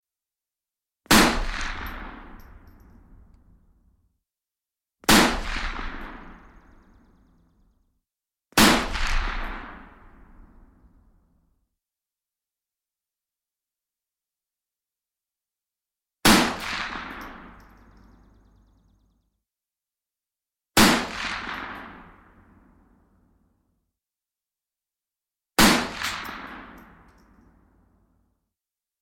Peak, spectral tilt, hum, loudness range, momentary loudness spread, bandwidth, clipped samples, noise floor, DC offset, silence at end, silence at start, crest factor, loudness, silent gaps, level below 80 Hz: -4 dBFS; -3 dB/octave; none; 12 LU; 23 LU; 16.5 kHz; under 0.1%; under -90 dBFS; under 0.1%; 2.2 s; 1.1 s; 26 dB; -22 LUFS; none; -40 dBFS